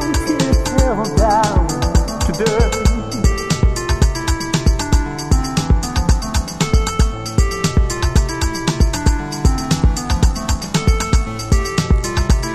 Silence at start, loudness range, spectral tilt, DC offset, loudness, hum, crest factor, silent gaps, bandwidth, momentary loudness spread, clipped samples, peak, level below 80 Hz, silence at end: 0 s; 1 LU; -5 dB/octave; under 0.1%; -17 LUFS; none; 14 dB; none; 14 kHz; 3 LU; under 0.1%; -2 dBFS; -18 dBFS; 0 s